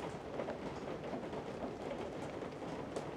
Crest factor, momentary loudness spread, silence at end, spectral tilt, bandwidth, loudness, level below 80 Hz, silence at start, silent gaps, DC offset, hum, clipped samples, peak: 16 dB; 1 LU; 0 s; -6 dB/octave; 15.5 kHz; -44 LUFS; -64 dBFS; 0 s; none; under 0.1%; none; under 0.1%; -26 dBFS